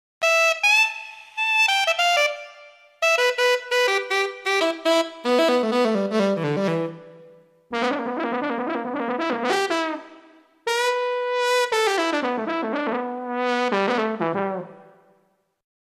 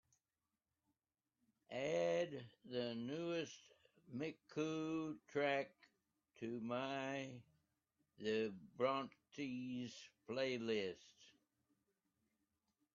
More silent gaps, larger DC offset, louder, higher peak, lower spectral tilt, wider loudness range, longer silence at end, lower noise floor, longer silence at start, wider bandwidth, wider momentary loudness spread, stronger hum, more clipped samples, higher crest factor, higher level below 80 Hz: neither; neither; first, -21 LUFS vs -45 LUFS; first, -6 dBFS vs -26 dBFS; about the same, -3.5 dB/octave vs -4 dB/octave; first, 6 LU vs 3 LU; second, 1.15 s vs 1.65 s; second, -66 dBFS vs under -90 dBFS; second, 0.2 s vs 1.7 s; first, 15.5 kHz vs 7.4 kHz; second, 10 LU vs 13 LU; neither; neither; about the same, 16 dB vs 20 dB; first, -76 dBFS vs -86 dBFS